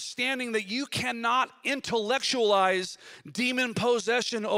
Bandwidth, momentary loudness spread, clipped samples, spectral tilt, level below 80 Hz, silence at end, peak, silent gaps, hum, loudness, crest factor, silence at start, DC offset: 16 kHz; 7 LU; under 0.1%; -3 dB/octave; -70 dBFS; 0 s; -10 dBFS; none; none; -27 LUFS; 18 dB; 0 s; under 0.1%